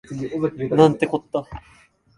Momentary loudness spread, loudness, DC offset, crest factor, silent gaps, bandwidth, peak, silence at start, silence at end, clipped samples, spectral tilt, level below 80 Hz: 18 LU; -21 LUFS; under 0.1%; 22 dB; none; 11 kHz; 0 dBFS; 0.1 s; 0.6 s; under 0.1%; -7.5 dB/octave; -50 dBFS